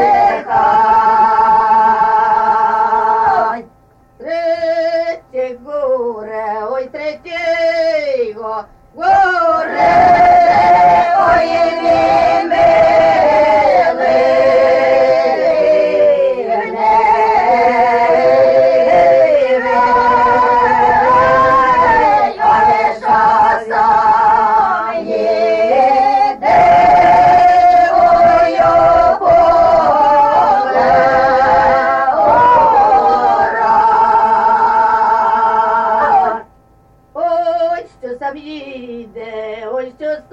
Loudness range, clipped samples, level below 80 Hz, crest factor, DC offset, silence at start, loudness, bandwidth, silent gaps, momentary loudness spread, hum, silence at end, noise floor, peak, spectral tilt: 9 LU; under 0.1%; -42 dBFS; 10 dB; under 0.1%; 0 s; -11 LUFS; 8 kHz; none; 13 LU; none; 0.15 s; -48 dBFS; -2 dBFS; -5.5 dB/octave